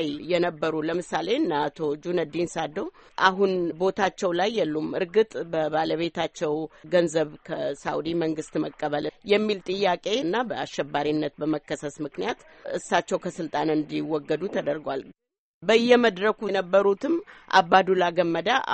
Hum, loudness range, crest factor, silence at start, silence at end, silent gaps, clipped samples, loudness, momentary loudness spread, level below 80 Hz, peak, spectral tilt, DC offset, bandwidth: none; 6 LU; 22 dB; 0 s; 0 s; 15.38-15.61 s; under 0.1%; -25 LUFS; 9 LU; -62 dBFS; -4 dBFS; -5 dB/octave; under 0.1%; 8.4 kHz